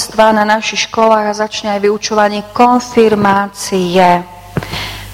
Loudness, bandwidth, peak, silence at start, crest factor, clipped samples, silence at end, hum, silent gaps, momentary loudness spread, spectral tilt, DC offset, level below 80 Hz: -12 LUFS; 16.5 kHz; 0 dBFS; 0 s; 12 dB; 0.3%; 0 s; none; none; 10 LU; -4.5 dB/octave; under 0.1%; -40 dBFS